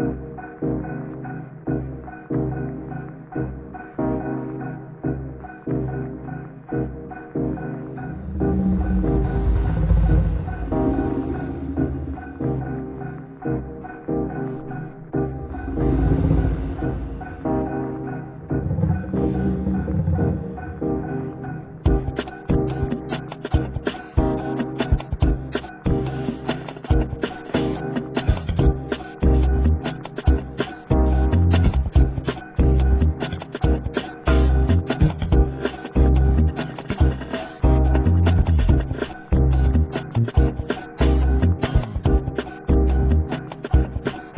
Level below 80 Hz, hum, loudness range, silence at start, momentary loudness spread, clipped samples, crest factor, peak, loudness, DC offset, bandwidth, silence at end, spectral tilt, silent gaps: -24 dBFS; none; 8 LU; 0 s; 12 LU; under 0.1%; 18 dB; -4 dBFS; -23 LUFS; under 0.1%; 4 kHz; 0 s; -12 dB/octave; none